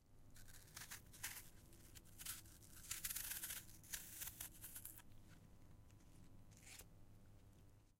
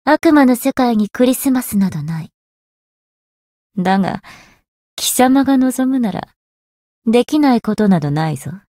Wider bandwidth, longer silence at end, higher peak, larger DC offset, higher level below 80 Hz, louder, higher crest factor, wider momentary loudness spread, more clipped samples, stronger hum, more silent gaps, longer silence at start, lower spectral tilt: about the same, 16 kHz vs 16.5 kHz; second, 0.05 s vs 0.2 s; second, -30 dBFS vs -2 dBFS; neither; second, -66 dBFS vs -52 dBFS; second, -52 LUFS vs -15 LUFS; first, 28 dB vs 14 dB; first, 21 LU vs 13 LU; neither; neither; second, none vs 2.34-3.70 s, 4.68-4.97 s, 6.36-7.02 s; about the same, 0 s vs 0.05 s; second, -1 dB/octave vs -5.5 dB/octave